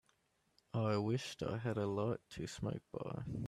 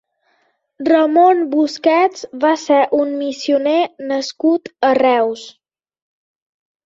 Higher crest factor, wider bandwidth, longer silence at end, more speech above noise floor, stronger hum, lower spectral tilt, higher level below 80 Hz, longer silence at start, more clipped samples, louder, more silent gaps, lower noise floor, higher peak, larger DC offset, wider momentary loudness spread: about the same, 16 dB vs 14 dB; first, 13 kHz vs 7.8 kHz; second, 0 s vs 1.35 s; second, 38 dB vs 48 dB; neither; first, -6.5 dB/octave vs -3.5 dB/octave; about the same, -66 dBFS vs -66 dBFS; about the same, 0.75 s vs 0.8 s; neither; second, -41 LUFS vs -15 LUFS; neither; first, -78 dBFS vs -63 dBFS; second, -24 dBFS vs -2 dBFS; neither; about the same, 8 LU vs 9 LU